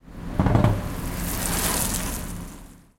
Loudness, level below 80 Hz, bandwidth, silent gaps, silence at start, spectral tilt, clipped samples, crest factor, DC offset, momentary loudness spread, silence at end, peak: -24 LUFS; -32 dBFS; 17 kHz; none; 0.05 s; -4.5 dB/octave; under 0.1%; 22 dB; under 0.1%; 16 LU; 0.2 s; -4 dBFS